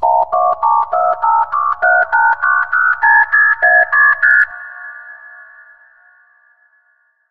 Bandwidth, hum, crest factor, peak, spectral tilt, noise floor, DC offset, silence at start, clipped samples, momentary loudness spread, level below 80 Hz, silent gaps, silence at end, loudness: 5.2 kHz; none; 14 dB; 0 dBFS; -4 dB/octave; -58 dBFS; under 0.1%; 0 s; under 0.1%; 10 LU; -58 dBFS; none; 1.95 s; -11 LUFS